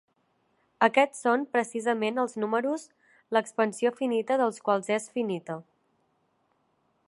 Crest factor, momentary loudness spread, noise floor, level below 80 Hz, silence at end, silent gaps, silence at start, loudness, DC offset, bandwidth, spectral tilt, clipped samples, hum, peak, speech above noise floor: 22 dB; 8 LU; -72 dBFS; -82 dBFS; 1.45 s; none; 0.8 s; -27 LUFS; under 0.1%; 11.5 kHz; -4.5 dB/octave; under 0.1%; none; -6 dBFS; 45 dB